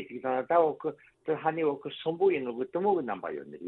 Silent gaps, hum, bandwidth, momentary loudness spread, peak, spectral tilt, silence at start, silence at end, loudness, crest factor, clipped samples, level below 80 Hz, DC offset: none; none; 4.1 kHz; 11 LU; -12 dBFS; -9 dB/octave; 0 s; 0 s; -30 LUFS; 18 dB; under 0.1%; -74 dBFS; under 0.1%